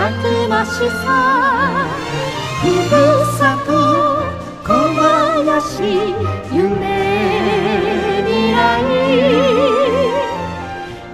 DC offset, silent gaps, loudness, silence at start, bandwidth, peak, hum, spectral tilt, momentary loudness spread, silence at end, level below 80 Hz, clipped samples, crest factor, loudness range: under 0.1%; none; -15 LUFS; 0 s; 15.5 kHz; -2 dBFS; none; -5.5 dB/octave; 8 LU; 0 s; -40 dBFS; under 0.1%; 14 dB; 2 LU